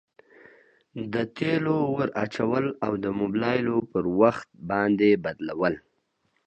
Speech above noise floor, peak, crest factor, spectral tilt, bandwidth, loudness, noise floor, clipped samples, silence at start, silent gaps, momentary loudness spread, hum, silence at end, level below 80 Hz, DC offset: 47 dB; -4 dBFS; 22 dB; -8 dB/octave; 8.4 kHz; -25 LUFS; -72 dBFS; under 0.1%; 0.95 s; none; 10 LU; none; 0.7 s; -60 dBFS; under 0.1%